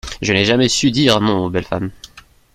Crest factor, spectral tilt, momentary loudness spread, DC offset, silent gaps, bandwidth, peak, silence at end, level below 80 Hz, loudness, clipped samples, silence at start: 16 dB; -4.5 dB/octave; 11 LU; under 0.1%; none; 15.5 kHz; 0 dBFS; 0.35 s; -42 dBFS; -15 LUFS; under 0.1%; 0.05 s